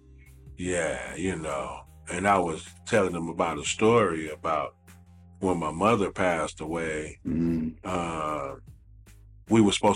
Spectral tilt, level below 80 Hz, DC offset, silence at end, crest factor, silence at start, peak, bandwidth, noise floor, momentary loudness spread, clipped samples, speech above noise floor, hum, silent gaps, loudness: -5 dB/octave; -50 dBFS; under 0.1%; 0 s; 18 dB; 0.3 s; -8 dBFS; 14.5 kHz; -52 dBFS; 12 LU; under 0.1%; 25 dB; none; none; -27 LUFS